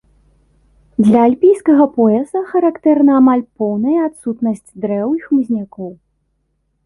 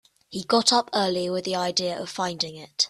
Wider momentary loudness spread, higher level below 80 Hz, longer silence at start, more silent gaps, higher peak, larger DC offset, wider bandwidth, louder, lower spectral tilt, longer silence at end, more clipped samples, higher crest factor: about the same, 11 LU vs 10 LU; first, -56 dBFS vs -66 dBFS; first, 1 s vs 0.3 s; neither; about the same, -2 dBFS vs -4 dBFS; neither; second, 11.5 kHz vs 13.5 kHz; first, -14 LUFS vs -24 LUFS; first, -8.5 dB/octave vs -3 dB/octave; first, 0.9 s vs 0 s; neither; second, 12 dB vs 22 dB